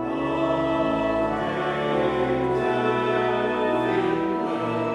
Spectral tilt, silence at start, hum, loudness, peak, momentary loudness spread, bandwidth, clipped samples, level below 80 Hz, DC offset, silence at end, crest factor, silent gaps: -7 dB/octave; 0 s; none; -24 LUFS; -10 dBFS; 3 LU; 10.5 kHz; under 0.1%; -50 dBFS; under 0.1%; 0 s; 12 dB; none